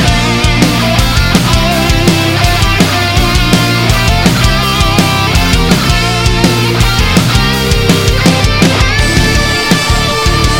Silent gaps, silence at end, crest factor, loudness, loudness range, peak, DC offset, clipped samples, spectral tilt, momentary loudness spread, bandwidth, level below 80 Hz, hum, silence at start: none; 0 s; 8 dB; -9 LUFS; 0 LU; 0 dBFS; under 0.1%; 0.3%; -4.5 dB/octave; 1 LU; 17 kHz; -16 dBFS; none; 0 s